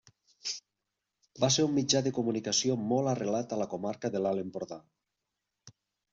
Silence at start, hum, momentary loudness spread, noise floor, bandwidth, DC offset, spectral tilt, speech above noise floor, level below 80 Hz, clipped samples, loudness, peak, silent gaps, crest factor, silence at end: 0.45 s; none; 13 LU; -86 dBFS; 8 kHz; under 0.1%; -4 dB/octave; 56 dB; -70 dBFS; under 0.1%; -31 LUFS; -14 dBFS; none; 20 dB; 0.45 s